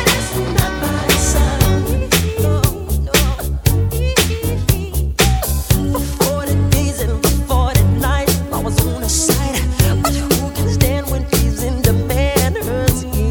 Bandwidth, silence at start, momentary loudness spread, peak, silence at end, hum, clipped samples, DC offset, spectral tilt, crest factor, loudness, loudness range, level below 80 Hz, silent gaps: 19.5 kHz; 0 s; 4 LU; 0 dBFS; 0 s; none; under 0.1%; under 0.1%; -4.5 dB/octave; 14 dB; -16 LUFS; 1 LU; -20 dBFS; none